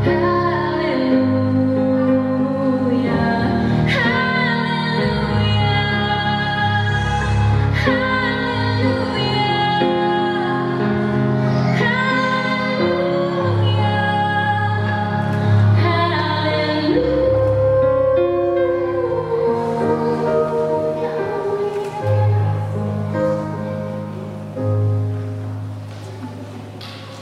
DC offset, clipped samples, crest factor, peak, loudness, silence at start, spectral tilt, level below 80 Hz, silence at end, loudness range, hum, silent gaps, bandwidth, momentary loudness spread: under 0.1%; under 0.1%; 14 dB; -4 dBFS; -18 LUFS; 0 s; -7.5 dB/octave; -38 dBFS; 0 s; 4 LU; none; none; 9.4 kHz; 9 LU